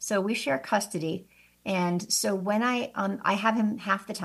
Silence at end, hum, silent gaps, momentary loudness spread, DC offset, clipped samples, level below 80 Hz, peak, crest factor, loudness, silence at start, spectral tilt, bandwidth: 0 s; none; none; 6 LU; under 0.1%; under 0.1%; -72 dBFS; -10 dBFS; 18 dB; -27 LUFS; 0 s; -4 dB/octave; 14.5 kHz